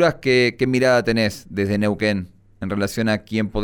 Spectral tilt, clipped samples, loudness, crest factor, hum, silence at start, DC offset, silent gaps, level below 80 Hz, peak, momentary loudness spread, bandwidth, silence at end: -5.5 dB/octave; under 0.1%; -20 LUFS; 16 dB; none; 0 s; under 0.1%; none; -42 dBFS; -4 dBFS; 10 LU; 20 kHz; 0 s